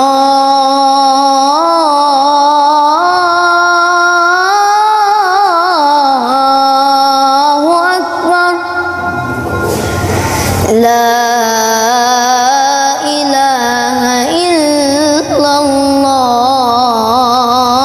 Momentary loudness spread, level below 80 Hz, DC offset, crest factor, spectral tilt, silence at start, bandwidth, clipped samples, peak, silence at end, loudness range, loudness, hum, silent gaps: 4 LU; -38 dBFS; under 0.1%; 8 dB; -3.5 dB/octave; 0 s; 16 kHz; under 0.1%; 0 dBFS; 0 s; 3 LU; -9 LUFS; none; none